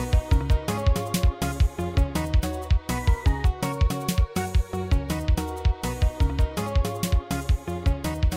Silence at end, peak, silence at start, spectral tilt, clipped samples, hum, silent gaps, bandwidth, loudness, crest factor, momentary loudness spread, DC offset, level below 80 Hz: 0 s; -8 dBFS; 0 s; -6 dB/octave; under 0.1%; none; none; 16 kHz; -26 LUFS; 14 dB; 3 LU; under 0.1%; -26 dBFS